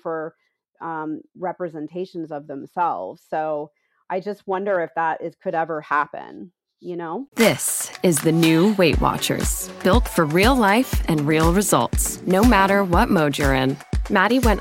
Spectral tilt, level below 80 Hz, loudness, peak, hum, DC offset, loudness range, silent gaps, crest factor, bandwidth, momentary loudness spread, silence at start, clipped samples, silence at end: -4.5 dB/octave; -32 dBFS; -20 LUFS; -2 dBFS; none; under 0.1%; 10 LU; 7.28-7.32 s; 18 dB; 16.5 kHz; 15 LU; 0.05 s; under 0.1%; 0 s